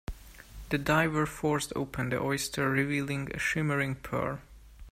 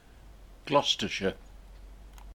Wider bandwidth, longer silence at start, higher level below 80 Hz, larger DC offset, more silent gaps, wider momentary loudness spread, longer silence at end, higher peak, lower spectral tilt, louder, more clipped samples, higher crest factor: about the same, 16 kHz vs 17 kHz; about the same, 0.1 s vs 0.15 s; about the same, -50 dBFS vs -50 dBFS; neither; neither; second, 15 LU vs 23 LU; about the same, 0 s vs 0 s; about the same, -10 dBFS vs -10 dBFS; first, -5 dB/octave vs -3.5 dB/octave; about the same, -30 LUFS vs -28 LUFS; neither; about the same, 20 dB vs 24 dB